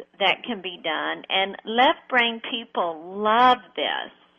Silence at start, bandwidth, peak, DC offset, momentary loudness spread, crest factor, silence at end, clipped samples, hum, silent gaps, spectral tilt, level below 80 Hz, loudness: 0 s; 7.2 kHz; -6 dBFS; under 0.1%; 11 LU; 18 dB; 0.3 s; under 0.1%; none; none; -4.5 dB/octave; -68 dBFS; -23 LUFS